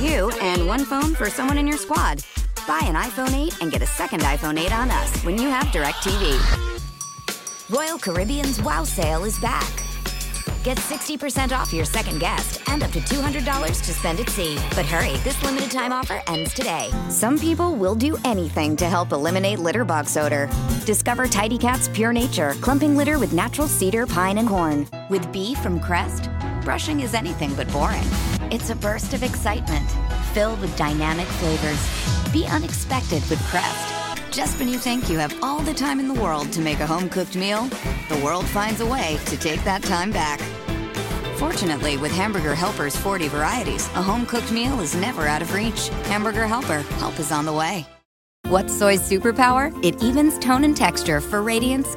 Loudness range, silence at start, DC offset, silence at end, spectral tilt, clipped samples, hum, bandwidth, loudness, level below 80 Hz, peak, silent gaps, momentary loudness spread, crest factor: 4 LU; 0 s; under 0.1%; 0 s; -4.5 dB/octave; under 0.1%; none; 17 kHz; -22 LUFS; -30 dBFS; -2 dBFS; 48.05-48.44 s; 6 LU; 20 dB